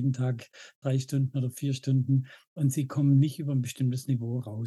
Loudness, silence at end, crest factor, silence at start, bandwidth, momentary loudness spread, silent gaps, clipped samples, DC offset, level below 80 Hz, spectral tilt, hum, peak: -29 LUFS; 0 s; 14 dB; 0 s; 12.5 kHz; 9 LU; 0.75-0.82 s, 2.47-2.56 s; under 0.1%; under 0.1%; -78 dBFS; -7.5 dB/octave; none; -14 dBFS